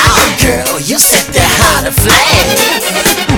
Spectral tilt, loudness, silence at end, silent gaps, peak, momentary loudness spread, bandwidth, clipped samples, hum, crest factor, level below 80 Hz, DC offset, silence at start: -2.5 dB/octave; -7 LUFS; 0 s; none; 0 dBFS; 4 LU; over 20 kHz; 0.9%; none; 8 dB; -22 dBFS; under 0.1%; 0 s